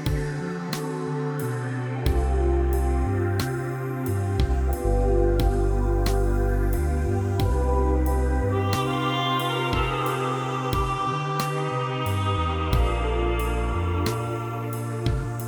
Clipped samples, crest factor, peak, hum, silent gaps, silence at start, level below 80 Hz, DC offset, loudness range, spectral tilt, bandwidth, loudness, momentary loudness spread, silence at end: under 0.1%; 14 dB; -8 dBFS; none; none; 0 s; -28 dBFS; under 0.1%; 2 LU; -6.5 dB/octave; 19.5 kHz; -25 LUFS; 6 LU; 0 s